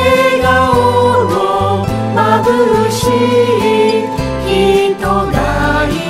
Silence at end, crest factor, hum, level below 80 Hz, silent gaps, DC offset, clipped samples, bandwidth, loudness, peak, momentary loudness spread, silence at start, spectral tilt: 0 s; 12 dB; none; -28 dBFS; none; under 0.1%; under 0.1%; 16 kHz; -12 LUFS; 0 dBFS; 5 LU; 0 s; -5.5 dB/octave